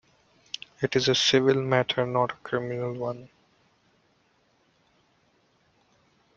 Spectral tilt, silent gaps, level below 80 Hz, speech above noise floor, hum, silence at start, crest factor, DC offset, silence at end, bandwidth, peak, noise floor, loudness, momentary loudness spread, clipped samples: -4.5 dB/octave; none; -66 dBFS; 42 dB; none; 0.8 s; 22 dB; under 0.1%; 3.1 s; 7.6 kHz; -6 dBFS; -67 dBFS; -25 LUFS; 19 LU; under 0.1%